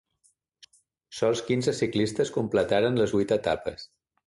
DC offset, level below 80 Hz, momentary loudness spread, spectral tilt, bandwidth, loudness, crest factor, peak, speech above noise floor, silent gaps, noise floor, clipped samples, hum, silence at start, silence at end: under 0.1%; -56 dBFS; 8 LU; -5.5 dB/octave; 11.5 kHz; -26 LUFS; 18 dB; -10 dBFS; 43 dB; none; -69 dBFS; under 0.1%; none; 1.1 s; 0.4 s